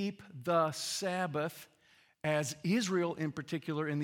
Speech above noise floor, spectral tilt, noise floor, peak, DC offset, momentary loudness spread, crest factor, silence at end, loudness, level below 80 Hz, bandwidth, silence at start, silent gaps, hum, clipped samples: 33 dB; -5 dB/octave; -67 dBFS; -18 dBFS; under 0.1%; 9 LU; 18 dB; 0 s; -35 LUFS; -78 dBFS; 18 kHz; 0 s; none; none; under 0.1%